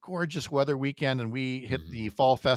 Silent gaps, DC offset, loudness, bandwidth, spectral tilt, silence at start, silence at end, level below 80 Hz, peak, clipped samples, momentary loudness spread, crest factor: none; under 0.1%; -29 LUFS; 14 kHz; -6 dB/octave; 0.05 s; 0 s; -60 dBFS; -10 dBFS; under 0.1%; 8 LU; 18 dB